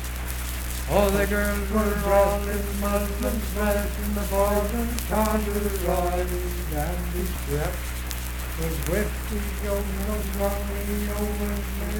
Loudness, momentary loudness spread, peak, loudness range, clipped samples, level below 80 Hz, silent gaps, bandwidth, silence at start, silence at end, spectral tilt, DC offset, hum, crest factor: -26 LUFS; 8 LU; -6 dBFS; 4 LU; under 0.1%; -30 dBFS; none; 19 kHz; 0 s; 0 s; -5 dB/octave; under 0.1%; none; 20 dB